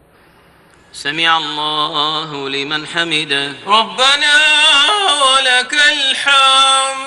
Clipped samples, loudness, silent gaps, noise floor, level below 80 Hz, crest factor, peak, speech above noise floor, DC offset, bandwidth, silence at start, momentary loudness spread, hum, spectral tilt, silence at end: under 0.1%; -11 LUFS; none; -48 dBFS; -56 dBFS; 14 dB; 0 dBFS; 34 dB; under 0.1%; 12 kHz; 0.95 s; 11 LU; none; -0.5 dB/octave; 0 s